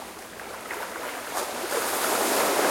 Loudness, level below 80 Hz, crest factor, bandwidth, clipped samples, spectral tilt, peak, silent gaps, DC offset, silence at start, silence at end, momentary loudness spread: -27 LUFS; -64 dBFS; 18 dB; 16.5 kHz; under 0.1%; -1 dB/octave; -10 dBFS; none; under 0.1%; 0 s; 0 s; 15 LU